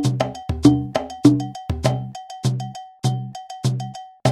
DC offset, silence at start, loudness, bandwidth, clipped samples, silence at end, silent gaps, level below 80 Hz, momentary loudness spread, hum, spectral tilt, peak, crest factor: under 0.1%; 0 s; -22 LUFS; 13 kHz; under 0.1%; 0 s; none; -40 dBFS; 13 LU; none; -7 dB/octave; 0 dBFS; 20 dB